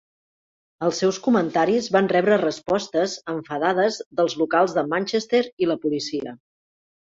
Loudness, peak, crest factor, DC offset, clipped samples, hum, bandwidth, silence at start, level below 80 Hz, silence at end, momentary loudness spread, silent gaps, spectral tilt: -22 LUFS; -4 dBFS; 18 dB; under 0.1%; under 0.1%; none; 7.8 kHz; 0.8 s; -64 dBFS; 0.65 s; 7 LU; 4.06-4.11 s, 5.52-5.57 s; -5 dB/octave